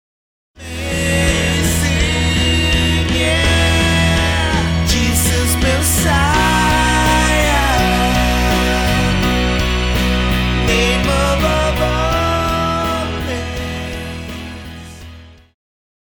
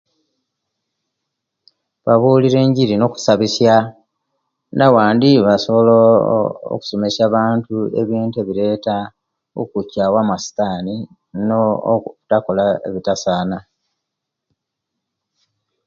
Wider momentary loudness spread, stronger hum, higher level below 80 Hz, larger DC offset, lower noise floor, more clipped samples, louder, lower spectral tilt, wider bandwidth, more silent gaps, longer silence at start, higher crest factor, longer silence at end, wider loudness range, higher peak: about the same, 11 LU vs 13 LU; neither; first, -22 dBFS vs -54 dBFS; neither; second, -37 dBFS vs -80 dBFS; neither; about the same, -15 LUFS vs -16 LUFS; second, -4 dB/octave vs -6.5 dB/octave; first, over 20 kHz vs 7.6 kHz; neither; second, 0.6 s vs 2.05 s; about the same, 14 dB vs 16 dB; second, 0.75 s vs 2.25 s; about the same, 6 LU vs 7 LU; about the same, -2 dBFS vs 0 dBFS